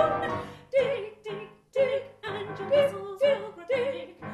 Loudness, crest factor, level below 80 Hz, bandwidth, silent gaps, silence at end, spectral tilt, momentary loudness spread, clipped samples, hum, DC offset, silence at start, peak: -29 LUFS; 18 dB; -62 dBFS; 12.5 kHz; none; 0 s; -5.5 dB/octave; 13 LU; under 0.1%; none; under 0.1%; 0 s; -10 dBFS